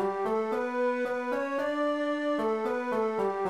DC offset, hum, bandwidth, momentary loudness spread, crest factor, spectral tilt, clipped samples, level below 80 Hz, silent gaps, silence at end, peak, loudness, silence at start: 0.1%; none; 13.5 kHz; 2 LU; 12 dB; -5.5 dB/octave; under 0.1%; -70 dBFS; none; 0 s; -18 dBFS; -30 LUFS; 0 s